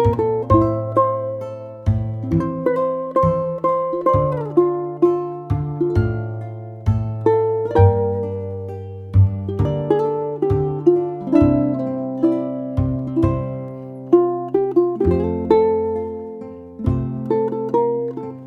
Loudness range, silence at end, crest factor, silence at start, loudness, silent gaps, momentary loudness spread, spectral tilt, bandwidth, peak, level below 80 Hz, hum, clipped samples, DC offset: 2 LU; 0 s; 18 dB; 0 s; -19 LUFS; none; 11 LU; -11 dB/octave; 4.7 kHz; -2 dBFS; -36 dBFS; none; under 0.1%; under 0.1%